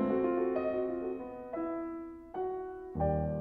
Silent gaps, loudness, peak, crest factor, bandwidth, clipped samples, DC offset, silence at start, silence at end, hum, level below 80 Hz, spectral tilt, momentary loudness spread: none; -35 LUFS; -18 dBFS; 16 dB; 4.8 kHz; under 0.1%; under 0.1%; 0 s; 0 s; none; -50 dBFS; -11 dB/octave; 11 LU